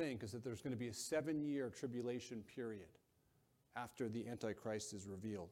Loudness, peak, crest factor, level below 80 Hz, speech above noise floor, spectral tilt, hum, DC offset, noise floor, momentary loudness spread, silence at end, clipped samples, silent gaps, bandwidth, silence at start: -46 LUFS; -28 dBFS; 18 dB; -78 dBFS; 32 dB; -5 dB/octave; none; under 0.1%; -78 dBFS; 9 LU; 0 s; under 0.1%; none; 16.5 kHz; 0 s